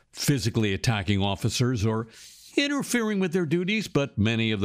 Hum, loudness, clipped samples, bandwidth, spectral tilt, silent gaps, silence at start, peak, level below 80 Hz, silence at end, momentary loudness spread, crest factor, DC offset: none; -26 LUFS; under 0.1%; 15.5 kHz; -5 dB/octave; none; 0.15 s; -10 dBFS; -52 dBFS; 0 s; 3 LU; 16 dB; under 0.1%